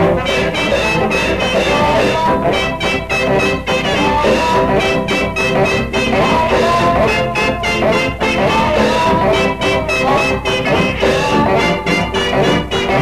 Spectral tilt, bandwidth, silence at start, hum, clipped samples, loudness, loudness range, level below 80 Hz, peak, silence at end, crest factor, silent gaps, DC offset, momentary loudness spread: -5 dB/octave; 14.5 kHz; 0 s; none; under 0.1%; -14 LUFS; 1 LU; -30 dBFS; -2 dBFS; 0 s; 12 dB; none; 0.8%; 3 LU